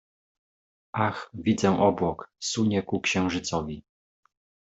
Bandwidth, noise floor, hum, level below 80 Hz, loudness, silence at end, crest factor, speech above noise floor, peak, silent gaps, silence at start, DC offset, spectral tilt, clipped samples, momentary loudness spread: 8.2 kHz; under -90 dBFS; none; -58 dBFS; -26 LUFS; 0.9 s; 20 dB; over 64 dB; -8 dBFS; none; 0.95 s; under 0.1%; -5 dB/octave; under 0.1%; 10 LU